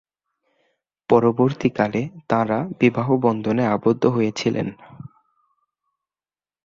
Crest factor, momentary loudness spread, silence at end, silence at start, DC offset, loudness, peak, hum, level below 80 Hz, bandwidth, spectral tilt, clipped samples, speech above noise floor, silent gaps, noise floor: 20 dB; 9 LU; 1.6 s; 1.1 s; under 0.1%; -20 LUFS; -2 dBFS; none; -58 dBFS; 7.6 kHz; -7 dB/octave; under 0.1%; over 70 dB; none; under -90 dBFS